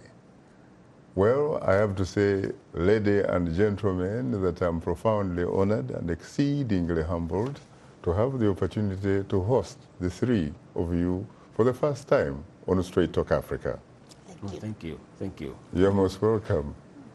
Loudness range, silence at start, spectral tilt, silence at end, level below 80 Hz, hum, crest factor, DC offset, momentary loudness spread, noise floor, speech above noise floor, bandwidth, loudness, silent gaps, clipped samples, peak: 4 LU; 0.05 s; -8 dB/octave; 0.05 s; -48 dBFS; none; 18 dB; under 0.1%; 12 LU; -53 dBFS; 27 dB; 12 kHz; -27 LUFS; none; under 0.1%; -8 dBFS